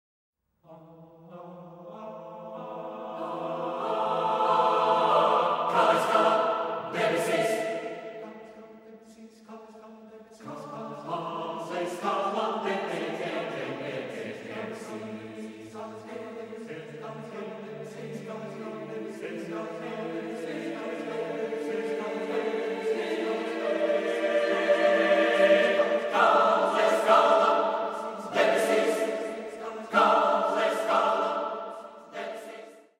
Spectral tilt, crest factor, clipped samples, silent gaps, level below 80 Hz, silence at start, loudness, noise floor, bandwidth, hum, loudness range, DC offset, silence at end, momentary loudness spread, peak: -4.5 dB/octave; 20 dB; under 0.1%; none; -78 dBFS; 0.7 s; -27 LUFS; -54 dBFS; 16 kHz; none; 16 LU; under 0.1%; 0.2 s; 19 LU; -8 dBFS